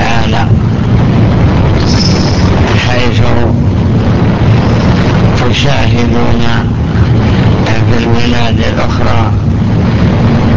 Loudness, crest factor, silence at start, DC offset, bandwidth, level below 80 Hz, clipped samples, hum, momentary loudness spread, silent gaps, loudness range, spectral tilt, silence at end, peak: -9 LUFS; 8 dB; 0 s; 6%; 7.4 kHz; -16 dBFS; 0.4%; none; 2 LU; none; 1 LU; -7 dB/octave; 0 s; 0 dBFS